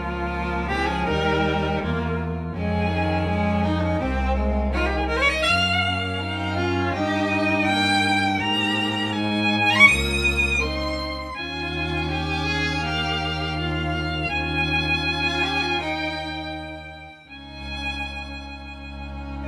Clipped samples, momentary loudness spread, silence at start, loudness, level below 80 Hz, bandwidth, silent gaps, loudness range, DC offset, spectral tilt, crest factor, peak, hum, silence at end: under 0.1%; 14 LU; 0 s; -22 LUFS; -34 dBFS; 13.5 kHz; none; 6 LU; under 0.1%; -5 dB/octave; 22 dB; -2 dBFS; none; 0 s